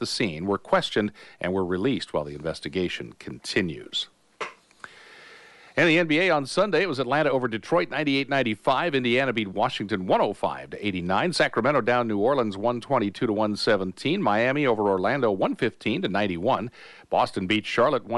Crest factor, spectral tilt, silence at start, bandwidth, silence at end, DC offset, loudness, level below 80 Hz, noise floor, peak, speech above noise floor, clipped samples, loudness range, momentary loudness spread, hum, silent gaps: 16 dB; -5.5 dB/octave; 0 s; 11.5 kHz; 0 s; under 0.1%; -25 LUFS; -60 dBFS; -50 dBFS; -8 dBFS; 25 dB; under 0.1%; 5 LU; 8 LU; none; none